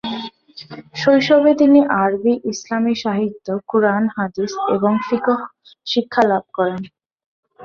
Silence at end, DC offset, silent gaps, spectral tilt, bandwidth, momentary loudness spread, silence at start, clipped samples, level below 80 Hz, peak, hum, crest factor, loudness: 0 s; under 0.1%; 7.26-7.43 s; -5.5 dB/octave; 7.2 kHz; 19 LU; 0.05 s; under 0.1%; -60 dBFS; -2 dBFS; none; 16 dB; -17 LUFS